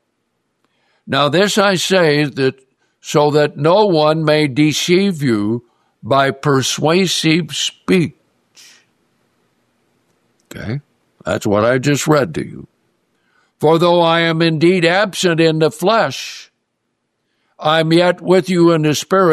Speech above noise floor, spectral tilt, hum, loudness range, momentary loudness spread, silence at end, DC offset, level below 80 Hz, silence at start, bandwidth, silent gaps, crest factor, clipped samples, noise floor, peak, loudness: 57 dB; -5 dB/octave; none; 7 LU; 12 LU; 0 s; under 0.1%; -58 dBFS; 1.05 s; 14 kHz; none; 14 dB; under 0.1%; -70 dBFS; 0 dBFS; -14 LUFS